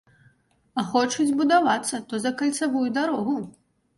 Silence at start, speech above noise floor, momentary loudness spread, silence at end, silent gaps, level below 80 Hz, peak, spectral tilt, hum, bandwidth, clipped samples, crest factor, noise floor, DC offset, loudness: 0.75 s; 38 dB; 11 LU; 0.5 s; none; -68 dBFS; -8 dBFS; -3.5 dB/octave; none; 11.5 kHz; under 0.1%; 18 dB; -62 dBFS; under 0.1%; -24 LUFS